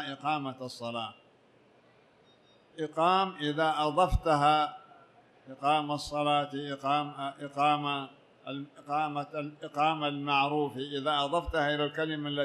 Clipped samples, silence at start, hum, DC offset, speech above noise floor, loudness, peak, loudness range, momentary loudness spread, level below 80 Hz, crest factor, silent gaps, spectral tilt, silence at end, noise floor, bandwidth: under 0.1%; 0 s; none; under 0.1%; 32 dB; -30 LUFS; -12 dBFS; 4 LU; 13 LU; -48 dBFS; 18 dB; none; -5.5 dB/octave; 0 s; -63 dBFS; 13 kHz